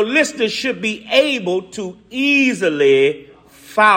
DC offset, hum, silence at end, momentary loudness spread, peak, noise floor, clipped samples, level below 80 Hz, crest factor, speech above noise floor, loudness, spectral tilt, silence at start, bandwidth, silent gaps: under 0.1%; none; 0 s; 13 LU; 0 dBFS; -42 dBFS; under 0.1%; -60 dBFS; 16 dB; 25 dB; -16 LUFS; -3.5 dB/octave; 0 s; 16 kHz; none